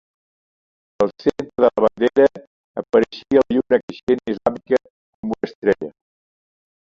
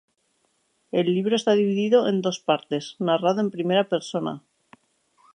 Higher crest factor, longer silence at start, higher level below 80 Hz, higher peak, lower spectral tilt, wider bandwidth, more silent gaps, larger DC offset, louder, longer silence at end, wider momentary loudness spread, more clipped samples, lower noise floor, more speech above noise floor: about the same, 18 dB vs 18 dB; about the same, 1 s vs 0.95 s; first, -56 dBFS vs -76 dBFS; first, -2 dBFS vs -6 dBFS; about the same, -7 dB/octave vs -6 dB/octave; second, 7.4 kHz vs 10 kHz; first, 2.47-2.74 s, 3.83-3.88 s, 4.03-4.07 s, 4.90-5.23 s, 5.55-5.62 s vs none; neither; first, -19 LUFS vs -23 LUFS; about the same, 1.05 s vs 1 s; about the same, 10 LU vs 9 LU; neither; first, under -90 dBFS vs -70 dBFS; first, over 72 dB vs 47 dB